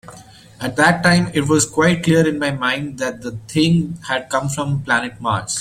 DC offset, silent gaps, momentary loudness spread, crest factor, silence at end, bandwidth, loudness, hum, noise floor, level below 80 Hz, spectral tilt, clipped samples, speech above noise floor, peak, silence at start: under 0.1%; none; 10 LU; 16 dB; 0 s; 15.5 kHz; -18 LUFS; none; -42 dBFS; -48 dBFS; -4.5 dB/octave; under 0.1%; 24 dB; -2 dBFS; 0.05 s